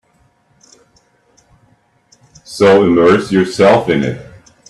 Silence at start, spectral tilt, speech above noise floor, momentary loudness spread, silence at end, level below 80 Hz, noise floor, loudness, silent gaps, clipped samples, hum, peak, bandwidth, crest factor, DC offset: 2.5 s; -6 dB/octave; 45 dB; 13 LU; 0.45 s; -50 dBFS; -55 dBFS; -11 LUFS; none; under 0.1%; none; 0 dBFS; 12.5 kHz; 14 dB; under 0.1%